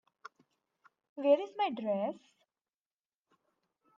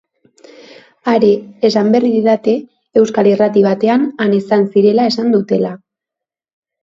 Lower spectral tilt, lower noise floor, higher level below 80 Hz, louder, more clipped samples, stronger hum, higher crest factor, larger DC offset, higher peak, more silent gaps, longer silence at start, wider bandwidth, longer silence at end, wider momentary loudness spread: about the same, -6.5 dB/octave vs -7 dB/octave; first, under -90 dBFS vs -85 dBFS; second, under -90 dBFS vs -62 dBFS; second, -33 LUFS vs -13 LUFS; neither; neither; first, 22 dB vs 14 dB; neither; second, -16 dBFS vs 0 dBFS; neither; about the same, 1.15 s vs 1.05 s; second, 6.8 kHz vs 7.6 kHz; first, 1.8 s vs 1.05 s; first, 19 LU vs 6 LU